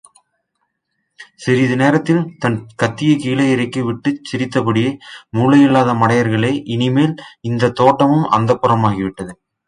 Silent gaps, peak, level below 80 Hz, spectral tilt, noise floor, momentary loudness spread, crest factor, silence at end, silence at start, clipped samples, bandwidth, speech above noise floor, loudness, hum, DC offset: none; 0 dBFS; -52 dBFS; -7 dB/octave; -71 dBFS; 10 LU; 16 dB; 0.35 s; 1.2 s; under 0.1%; 10.5 kHz; 57 dB; -15 LUFS; none; under 0.1%